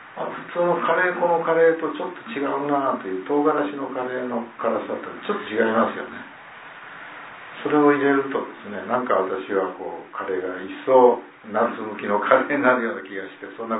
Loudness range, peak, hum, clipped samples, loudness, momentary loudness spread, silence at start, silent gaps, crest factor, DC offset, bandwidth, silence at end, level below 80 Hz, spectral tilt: 5 LU; 0 dBFS; none; under 0.1%; -22 LUFS; 17 LU; 0 s; none; 22 dB; under 0.1%; 4 kHz; 0 s; -74 dBFS; -10 dB/octave